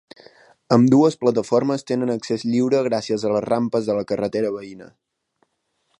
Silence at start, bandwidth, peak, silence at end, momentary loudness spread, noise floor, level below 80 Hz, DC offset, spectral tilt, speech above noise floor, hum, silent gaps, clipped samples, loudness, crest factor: 0.7 s; 11 kHz; -2 dBFS; 1.15 s; 9 LU; -71 dBFS; -62 dBFS; under 0.1%; -7 dB/octave; 52 dB; none; none; under 0.1%; -20 LUFS; 20 dB